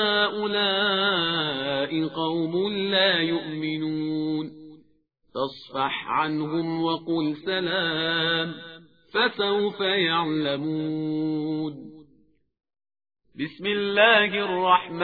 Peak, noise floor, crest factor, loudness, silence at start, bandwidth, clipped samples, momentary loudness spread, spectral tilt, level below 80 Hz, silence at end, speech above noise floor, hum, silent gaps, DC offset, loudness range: -4 dBFS; -65 dBFS; 22 dB; -24 LUFS; 0 s; 5 kHz; under 0.1%; 10 LU; -7 dB/octave; -66 dBFS; 0 s; 41 dB; none; none; under 0.1%; 5 LU